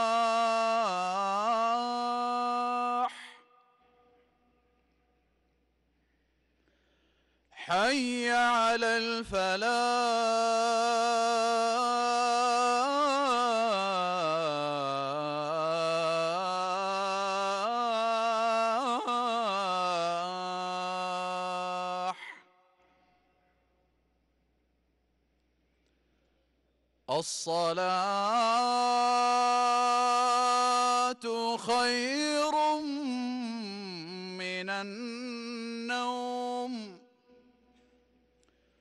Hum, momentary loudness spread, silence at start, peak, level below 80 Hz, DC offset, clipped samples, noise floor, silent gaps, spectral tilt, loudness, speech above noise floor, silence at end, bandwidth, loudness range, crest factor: none; 10 LU; 0 s; -20 dBFS; -70 dBFS; under 0.1%; under 0.1%; -74 dBFS; none; -3 dB/octave; -29 LUFS; 46 dB; 1.85 s; 12 kHz; 10 LU; 12 dB